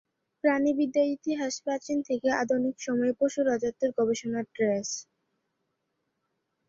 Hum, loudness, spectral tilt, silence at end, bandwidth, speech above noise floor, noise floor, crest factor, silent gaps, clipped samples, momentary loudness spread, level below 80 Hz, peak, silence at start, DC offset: none; -28 LUFS; -4 dB/octave; 1.65 s; 7.8 kHz; 52 dB; -80 dBFS; 18 dB; none; under 0.1%; 5 LU; -70 dBFS; -12 dBFS; 0.45 s; under 0.1%